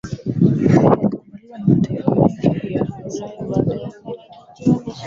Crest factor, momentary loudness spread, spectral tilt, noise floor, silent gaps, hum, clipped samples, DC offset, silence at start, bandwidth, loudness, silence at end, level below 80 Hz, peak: 16 dB; 18 LU; -9 dB/octave; -40 dBFS; none; none; under 0.1%; under 0.1%; 0.05 s; 7.6 kHz; -18 LUFS; 0 s; -46 dBFS; -2 dBFS